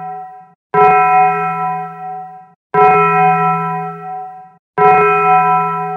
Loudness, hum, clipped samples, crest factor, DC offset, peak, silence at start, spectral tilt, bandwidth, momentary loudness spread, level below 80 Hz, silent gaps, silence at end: -12 LUFS; 60 Hz at -50 dBFS; under 0.1%; 14 dB; under 0.1%; 0 dBFS; 0 s; -8 dB/octave; 4.8 kHz; 18 LU; -60 dBFS; 0.55-0.70 s, 2.56-2.70 s, 4.59-4.74 s; 0 s